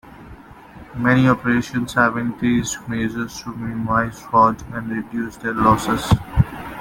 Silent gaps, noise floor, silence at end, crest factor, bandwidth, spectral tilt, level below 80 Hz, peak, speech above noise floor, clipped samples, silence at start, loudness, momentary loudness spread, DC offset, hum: none; -41 dBFS; 0 s; 18 dB; 17 kHz; -6 dB/octave; -38 dBFS; -2 dBFS; 22 dB; under 0.1%; 0.05 s; -20 LUFS; 12 LU; under 0.1%; none